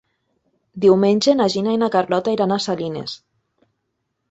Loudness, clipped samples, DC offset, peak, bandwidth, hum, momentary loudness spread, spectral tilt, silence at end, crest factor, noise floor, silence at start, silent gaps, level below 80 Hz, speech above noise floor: -18 LUFS; under 0.1%; under 0.1%; -2 dBFS; 8.2 kHz; none; 13 LU; -5.5 dB/octave; 1.15 s; 18 dB; -74 dBFS; 0.75 s; none; -60 dBFS; 57 dB